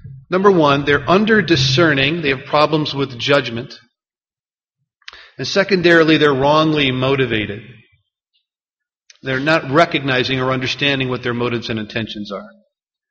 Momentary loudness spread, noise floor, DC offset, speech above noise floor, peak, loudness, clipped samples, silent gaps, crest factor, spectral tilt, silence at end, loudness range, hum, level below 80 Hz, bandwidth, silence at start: 14 LU; under -90 dBFS; under 0.1%; over 74 dB; 0 dBFS; -15 LUFS; under 0.1%; 4.40-4.44 s; 18 dB; -3.5 dB/octave; 0.6 s; 5 LU; none; -48 dBFS; 7.2 kHz; 0.05 s